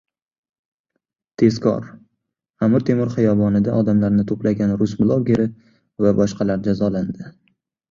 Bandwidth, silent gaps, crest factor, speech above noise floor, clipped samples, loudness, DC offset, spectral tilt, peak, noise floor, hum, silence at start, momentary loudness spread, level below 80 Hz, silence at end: 7.2 kHz; 2.50-2.54 s; 18 dB; 59 dB; under 0.1%; -19 LUFS; under 0.1%; -8.5 dB/octave; -2 dBFS; -77 dBFS; none; 1.4 s; 8 LU; -48 dBFS; 0.6 s